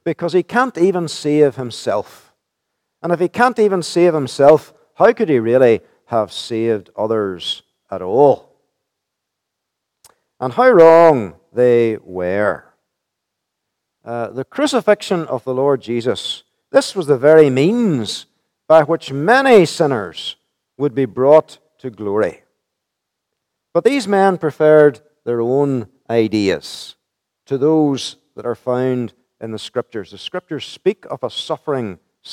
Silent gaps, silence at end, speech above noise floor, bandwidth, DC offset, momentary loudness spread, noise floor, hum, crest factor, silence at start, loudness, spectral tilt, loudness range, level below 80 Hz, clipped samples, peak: none; 0 s; 63 dB; 13.5 kHz; under 0.1%; 16 LU; -78 dBFS; none; 16 dB; 0.05 s; -16 LUFS; -5.5 dB/octave; 7 LU; -64 dBFS; under 0.1%; 0 dBFS